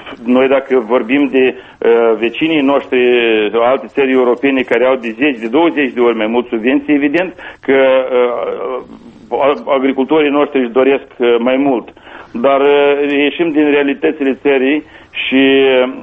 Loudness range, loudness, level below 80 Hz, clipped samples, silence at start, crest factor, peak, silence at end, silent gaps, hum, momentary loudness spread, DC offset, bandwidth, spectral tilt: 2 LU; -12 LUFS; -54 dBFS; under 0.1%; 0 s; 12 dB; 0 dBFS; 0 s; none; none; 6 LU; under 0.1%; 4.6 kHz; -7 dB/octave